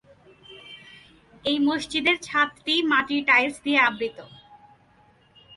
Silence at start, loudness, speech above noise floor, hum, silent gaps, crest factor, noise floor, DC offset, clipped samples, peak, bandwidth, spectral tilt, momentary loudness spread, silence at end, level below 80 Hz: 0.5 s; -22 LUFS; 35 dB; none; none; 20 dB; -58 dBFS; under 0.1%; under 0.1%; -6 dBFS; 11.5 kHz; -3 dB/octave; 20 LU; 1.3 s; -62 dBFS